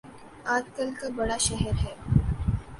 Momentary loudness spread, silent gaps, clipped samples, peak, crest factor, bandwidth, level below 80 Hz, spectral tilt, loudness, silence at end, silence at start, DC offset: 7 LU; none; under 0.1%; -6 dBFS; 22 dB; 11.5 kHz; -36 dBFS; -4.5 dB/octave; -28 LUFS; 0 s; 0.05 s; under 0.1%